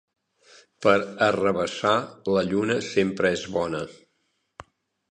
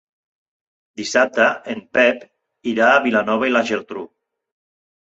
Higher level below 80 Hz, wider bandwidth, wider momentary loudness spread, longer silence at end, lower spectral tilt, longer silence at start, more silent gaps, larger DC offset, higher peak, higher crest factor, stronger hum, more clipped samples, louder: first, -58 dBFS vs -64 dBFS; first, 10.5 kHz vs 8.2 kHz; second, 6 LU vs 16 LU; second, 0.5 s vs 0.95 s; first, -5 dB/octave vs -3.5 dB/octave; second, 0.8 s vs 1 s; neither; neither; second, -4 dBFS vs 0 dBFS; about the same, 22 dB vs 20 dB; neither; neither; second, -24 LUFS vs -17 LUFS